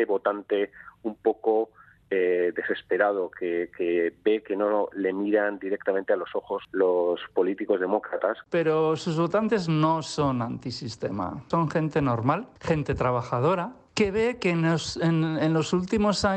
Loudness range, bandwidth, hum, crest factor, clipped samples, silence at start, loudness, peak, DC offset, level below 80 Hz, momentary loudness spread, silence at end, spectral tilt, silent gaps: 2 LU; 9.2 kHz; none; 16 dB; under 0.1%; 0 s; -26 LUFS; -8 dBFS; under 0.1%; -54 dBFS; 7 LU; 0 s; -6.5 dB/octave; none